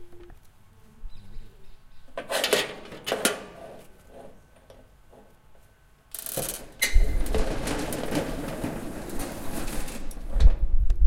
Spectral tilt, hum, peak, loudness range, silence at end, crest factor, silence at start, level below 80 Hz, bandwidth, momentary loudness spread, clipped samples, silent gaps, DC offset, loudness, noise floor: -3.5 dB/octave; none; -4 dBFS; 5 LU; 0 s; 22 dB; 0 s; -28 dBFS; 17 kHz; 25 LU; under 0.1%; none; under 0.1%; -29 LUFS; -56 dBFS